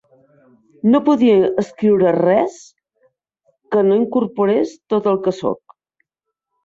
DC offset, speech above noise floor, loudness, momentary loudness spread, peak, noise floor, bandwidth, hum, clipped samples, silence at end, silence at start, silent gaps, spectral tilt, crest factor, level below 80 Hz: under 0.1%; 65 dB; -16 LUFS; 8 LU; -4 dBFS; -80 dBFS; 7.8 kHz; none; under 0.1%; 1.1 s; 0.85 s; none; -7.5 dB/octave; 14 dB; -60 dBFS